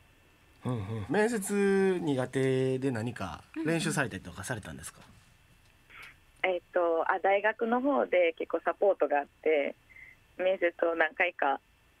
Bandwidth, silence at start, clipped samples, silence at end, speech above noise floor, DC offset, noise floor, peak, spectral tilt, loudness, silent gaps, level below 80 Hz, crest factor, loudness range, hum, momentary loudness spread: 15.5 kHz; 0.65 s; under 0.1%; 0.45 s; 32 dB; under 0.1%; -62 dBFS; -10 dBFS; -5.5 dB/octave; -30 LUFS; none; -66 dBFS; 20 dB; 7 LU; none; 13 LU